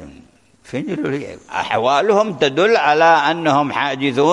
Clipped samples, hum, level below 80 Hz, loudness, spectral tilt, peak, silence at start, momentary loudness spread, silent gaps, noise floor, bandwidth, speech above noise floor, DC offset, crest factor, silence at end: under 0.1%; none; -58 dBFS; -16 LUFS; -5 dB/octave; -2 dBFS; 0 s; 13 LU; none; -48 dBFS; 11 kHz; 32 dB; under 0.1%; 14 dB; 0 s